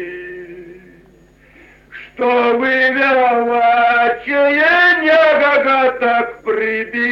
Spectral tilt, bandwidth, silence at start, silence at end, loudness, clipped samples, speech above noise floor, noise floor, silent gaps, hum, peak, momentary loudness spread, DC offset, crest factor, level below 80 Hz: -4.5 dB/octave; 7.2 kHz; 0 s; 0 s; -13 LUFS; under 0.1%; 33 dB; -47 dBFS; none; none; -2 dBFS; 14 LU; under 0.1%; 12 dB; -54 dBFS